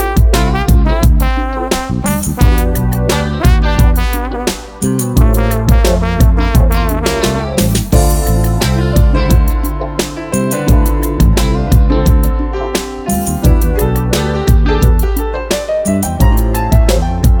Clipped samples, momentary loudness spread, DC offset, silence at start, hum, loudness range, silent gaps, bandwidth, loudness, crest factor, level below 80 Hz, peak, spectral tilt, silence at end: under 0.1%; 6 LU; under 0.1%; 0 s; none; 1 LU; none; 19.5 kHz; -13 LUFS; 10 dB; -12 dBFS; 0 dBFS; -6 dB/octave; 0 s